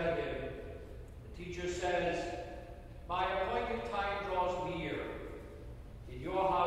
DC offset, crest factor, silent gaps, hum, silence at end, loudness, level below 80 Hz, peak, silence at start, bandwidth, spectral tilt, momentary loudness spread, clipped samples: under 0.1%; 18 dB; none; none; 0 s; -37 LUFS; -50 dBFS; -20 dBFS; 0 s; 15 kHz; -5.5 dB/octave; 17 LU; under 0.1%